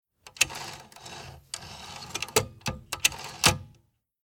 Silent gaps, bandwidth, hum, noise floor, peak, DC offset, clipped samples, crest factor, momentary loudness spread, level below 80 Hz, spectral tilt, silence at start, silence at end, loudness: none; 19.5 kHz; none; -65 dBFS; -4 dBFS; under 0.1%; under 0.1%; 28 dB; 19 LU; -52 dBFS; -1.5 dB/octave; 0.25 s; 0.5 s; -27 LUFS